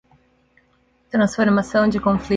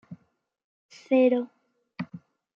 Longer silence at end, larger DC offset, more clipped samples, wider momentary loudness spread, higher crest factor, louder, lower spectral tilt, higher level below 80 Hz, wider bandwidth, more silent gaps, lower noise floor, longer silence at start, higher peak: second, 0 s vs 0.4 s; neither; neither; second, 3 LU vs 19 LU; about the same, 16 dB vs 18 dB; first, -19 LUFS vs -24 LUFS; about the same, -6.5 dB/octave vs -7.5 dB/octave; first, -46 dBFS vs -80 dBFS; first, 9.2 kHz vs 7.2 kHz; second, none vs 0.64-0.89 s; second, -61 dBFS vs -69 dBFS; first, 1.15 s vs 0.1 s; first, -6 dBFS vs -10 dBFS